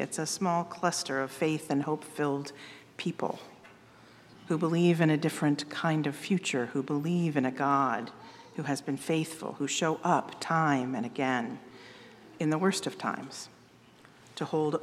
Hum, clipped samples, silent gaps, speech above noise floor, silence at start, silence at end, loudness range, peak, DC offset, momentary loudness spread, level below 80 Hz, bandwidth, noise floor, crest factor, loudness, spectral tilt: none; under 0.1%; none; 28 dB; 0 s; 0 s; 5 LU; -10 dBFS; under 0.1%; 17 LU; -78 dBFS; 15 kHz; -57 dBFS; 20 dB; -30 LUFS; -5 dB/octave